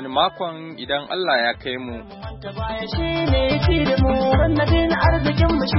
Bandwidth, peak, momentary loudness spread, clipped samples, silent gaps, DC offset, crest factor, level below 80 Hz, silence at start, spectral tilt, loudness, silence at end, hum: 5.8 kHz; -4 dBFS; 14 LU; under 0.1%; none; under 0.1%; 14 dB; -28 dBFS; 0 s; -10.5 dB/octave; -20 LUFS; 0 s; none